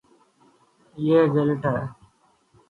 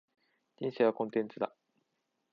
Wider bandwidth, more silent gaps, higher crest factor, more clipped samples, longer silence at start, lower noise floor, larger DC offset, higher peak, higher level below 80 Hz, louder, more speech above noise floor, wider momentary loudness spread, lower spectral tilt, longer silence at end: second, 4.5 kHz vs 5.6 kHz; neither; about the same, 18 dB vs 22 dB; neither; first, 0.95 s vs 0.6 s; second, -62 dBFS vs -82 dBFS; neither; first, -8 dBFS vs -14 dBFS; first, -60 dBFS vs -86 dBFS; first, -22 LUFS vs -34 LUFS; second, 41 dB vs 50 dB; about the same, 11 LU vs 10 LU; about the same, -9.5 dB/octave vs -8.5 dB/octave; about the same, 0.75 s vs 0.85 s